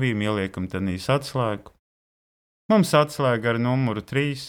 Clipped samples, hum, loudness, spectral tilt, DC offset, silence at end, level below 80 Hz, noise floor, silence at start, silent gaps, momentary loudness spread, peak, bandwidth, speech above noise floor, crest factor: under 0.1%; none; -23 LUFS; -6 dB/octave; under 0.1%; 0 s; -56 dBFS; under -90 dBFS; 0 s; 1.79-2.69 s; 9 LU; -6 dBFS; 17.5 kHz; over 67 dB; 18 dB